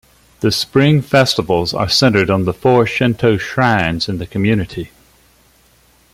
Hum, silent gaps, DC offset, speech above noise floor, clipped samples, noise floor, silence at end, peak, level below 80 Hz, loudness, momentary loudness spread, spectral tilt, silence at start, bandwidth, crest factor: none; none; under 0.1%; 38 dB; under 0.1%; -52 dBFS; 1.25 s; -2 dBFS; -44 dBFS; -14 LUFS; 8 LU; -5.5 dB/octave; 0.4 s; 16 kHz; 14 dB